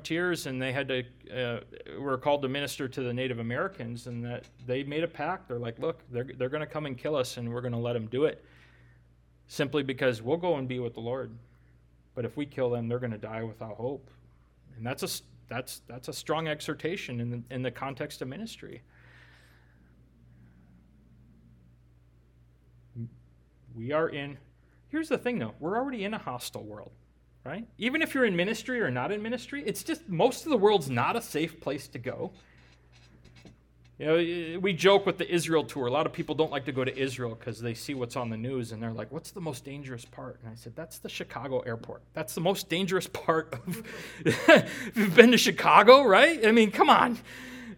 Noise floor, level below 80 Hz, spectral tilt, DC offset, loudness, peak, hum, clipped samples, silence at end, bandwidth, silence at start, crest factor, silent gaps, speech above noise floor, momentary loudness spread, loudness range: -61 dBFS; -62 dBFS; -5 dB/octave; under 0.1%; -28 LUFS; 0 dBFS; none; under 0.1%; 0 s; 19 kHz; 0 s; 30 dB; none; 33 dB; 19 LU; 14 LU